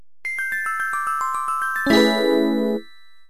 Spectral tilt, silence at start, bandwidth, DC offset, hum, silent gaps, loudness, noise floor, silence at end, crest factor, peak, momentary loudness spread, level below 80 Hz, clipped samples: -4 dB/octave; 0.25 s; 14.5 kHz; 1%; none; none; -21 LUFS; -47 dBFS; 0.45 s; 16 dB; -6 dBFS; 9 LU; -56 dBFS; under 0.1%